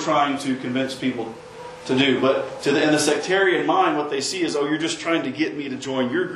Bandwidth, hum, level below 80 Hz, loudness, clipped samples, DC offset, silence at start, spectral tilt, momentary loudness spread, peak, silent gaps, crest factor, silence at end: 12.5 kHz; none; -64 dBFS; -21 LUFS; under 0.1%; under 0.1%; 0 s; -4 dB/octave; 9 LU; -6 dBFS; none; 16 dB; 0 s